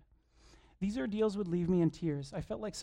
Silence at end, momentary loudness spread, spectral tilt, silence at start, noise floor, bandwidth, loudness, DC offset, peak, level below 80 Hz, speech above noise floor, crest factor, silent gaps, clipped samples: 0 s; 9 LU; -7 dB/octave; 0.55 s; -64 dBFS; 10.5 kHz; -35 LUFS; under 0.1%; -20 dBFS; -58 dBFS; 31 dB; 16 dB; none; under 0.1%